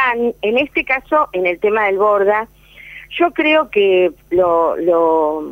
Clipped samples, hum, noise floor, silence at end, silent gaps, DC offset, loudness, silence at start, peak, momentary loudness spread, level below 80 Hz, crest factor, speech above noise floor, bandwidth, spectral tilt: under 0.1%; none; -38 dBFS; 0 s; none; under 0.1%; -15 LUFS; 0 s; -2 dBFS; 5 LU; -50 dBFS; 12 dB; 23 dB; 16 kHz; -6 dB/octave